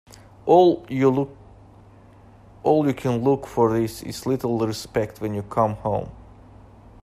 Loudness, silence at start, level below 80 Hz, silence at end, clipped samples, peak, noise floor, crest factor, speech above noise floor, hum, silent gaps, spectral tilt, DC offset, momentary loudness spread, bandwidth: -22 LUFS; 0.45 s; -50 dBFS; 0.8 s; under 0.1%; -4 dBFS; -49 dBFS; 20 dB; 28 dB; none; none; -7 dB/octave; under 0.1%; 12 LU; 15 kHz